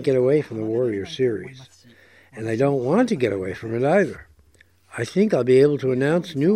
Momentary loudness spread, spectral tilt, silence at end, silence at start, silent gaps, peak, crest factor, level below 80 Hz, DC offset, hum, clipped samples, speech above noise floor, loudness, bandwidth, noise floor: 14 LU; -7 dB/octave; 0 s; 0 s; none; -6 dBFS; 16 dB; -60 dBFS; under 0.1%; none; under 0.1%; 36 dB; -21 LUFS; 11.5 kHz; -57 dBFS